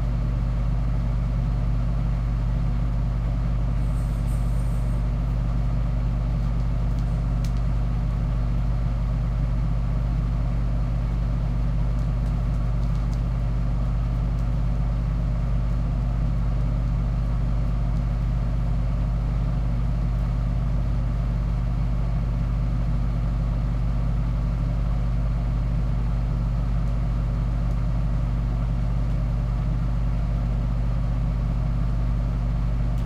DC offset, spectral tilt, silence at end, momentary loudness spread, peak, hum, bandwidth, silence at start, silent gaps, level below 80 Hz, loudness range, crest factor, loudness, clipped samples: under 0.1%; -8.5 dB/octave; 0 s; 0 LU; -12 dBFS; none; 5.2 kHz; 0 s; none; -24 dBFS; 0 LU; 10 dB; -26 LUFS; under 0.1%